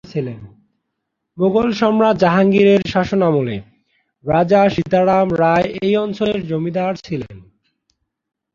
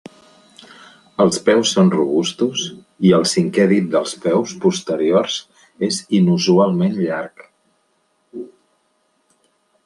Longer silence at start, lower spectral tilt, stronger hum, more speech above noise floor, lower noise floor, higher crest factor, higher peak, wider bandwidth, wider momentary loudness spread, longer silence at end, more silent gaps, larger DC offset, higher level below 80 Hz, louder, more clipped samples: second, 0.05 s vs 1.2 s; first, -7.5 dB/octave vs -5 dB/octave; neither; first, 60 dB vs 48 dB; first, -76 dBFS vs -64 dBFS; about the same, 16 dB vs 18 dB; about the same, -2 dBFS vs -2 dBFS; second, 7.2 kHz vs 11.5 kHz; about the same, 14 LU vs 15 LU; second, 1.15 s vs 1.4 s; neither; neither; first, -48 dBFS vs -62 dBFS; about the same, -16 LUFS vs -17 LUFS; neither